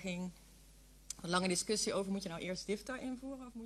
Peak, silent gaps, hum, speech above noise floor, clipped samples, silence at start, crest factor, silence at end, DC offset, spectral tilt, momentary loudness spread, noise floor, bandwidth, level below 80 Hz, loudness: -18 dBFS; none; none; 22 dB; under 0.1%; 0 s; 22 dB; 0 s; under 0.1%; -3.5 dB/octave; 13 LU; -61 dBFS; 13.5 kHz; -62 dBFS; -39 LUFS